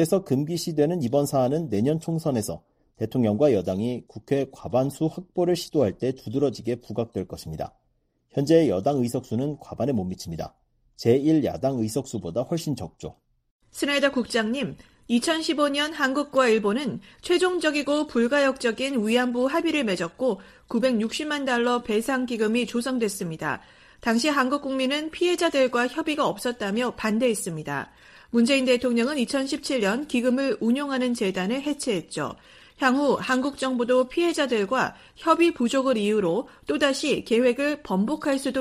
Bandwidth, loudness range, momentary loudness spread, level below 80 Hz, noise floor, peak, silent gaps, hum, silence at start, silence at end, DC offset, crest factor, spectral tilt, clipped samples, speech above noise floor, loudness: 15.5 kHz; 3 LU; 10 LU; -58 dBFS; -70 dBFS; -6 dBFS; 13.51-13.60 s; none; 0 s; 0 s; under 0.1%; 18 dB; -5 dB/octave; under 0.1%; 46 dB; -24 LUFS